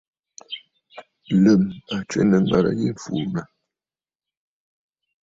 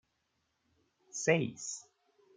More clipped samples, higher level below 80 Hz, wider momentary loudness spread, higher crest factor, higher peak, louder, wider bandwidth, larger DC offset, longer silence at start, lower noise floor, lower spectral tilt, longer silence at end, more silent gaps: neither; first, -54 dBFS vs -82 dBFS; first, 19 LU vs 15 LU; second, 18 dB vs 26 dB; first, -4 dBFS vs -12 dBFS; first, -21 LUFS vs -33 LUFS; second, 7.8 kHz vs 9.8 kHz; neither; second, 0.5 s vs 1.15 s; first, under -90 dBFS vs -80 dBFS; first, -7 dB/octave vs -4 dB/octave; first, 1.8 s vs 0.55 s; neither